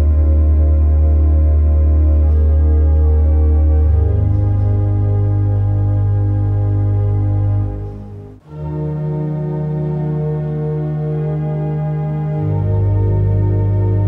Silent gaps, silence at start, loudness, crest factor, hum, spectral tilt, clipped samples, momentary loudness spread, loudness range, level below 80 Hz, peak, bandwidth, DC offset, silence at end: none; 0 s; -16 LUFS; 8 dB; none; -12.5 dB/octave; under 0.1%; 7 LU; 7 LU; -16 dBFS; -6 dBFS; 2.4 kHz; under 0.1%; 0 s